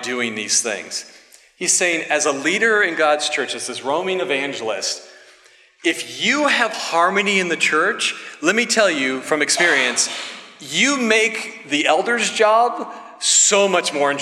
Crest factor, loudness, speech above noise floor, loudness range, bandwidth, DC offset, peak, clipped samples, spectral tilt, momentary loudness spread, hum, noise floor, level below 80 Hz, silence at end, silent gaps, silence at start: 18 dB; -17 LUFS; 32 dB; 4 LU; 15.5 kHz; under 0.1%; 0 dBFS; under 0.1%; -1 dB/octave; 9 LU; none; -51 dBFS; -80 dBFS; 0 s; none; 0 s